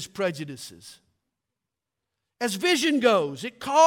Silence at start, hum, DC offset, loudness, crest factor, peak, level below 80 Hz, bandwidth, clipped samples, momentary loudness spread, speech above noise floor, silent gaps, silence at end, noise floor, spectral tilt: 0 s; none; under 0.1%; -24 LUFS; 20 dB; -6 dBFS; -72 dBFS; 17.5 kHz; under 0.1%; 17 LU; 62 dB; none; 0 s; -86 dBFS; -3.5 dB/octave